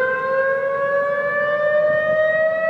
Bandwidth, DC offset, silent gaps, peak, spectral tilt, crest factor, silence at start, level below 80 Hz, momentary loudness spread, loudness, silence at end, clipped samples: 5.6 kHz; under 0.1%; none; -8 dBFS; -6 dB/octave; 10 dB; 0 s; -62 dBFS; 3 LU; -19 LUFS; 0 s; under 0.1%